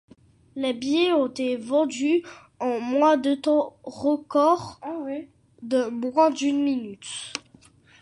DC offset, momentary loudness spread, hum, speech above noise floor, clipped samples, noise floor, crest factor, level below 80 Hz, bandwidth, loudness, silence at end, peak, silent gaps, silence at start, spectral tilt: under 0.1%; 14 LU; none; 31 dB; under 0.1%; -55 dBFS; 18 dB; -66 dBFS; 11 kHz; -24 LUFS; 0.65 s; -6 dBFS; none; 0.55 s; -4 dB/octave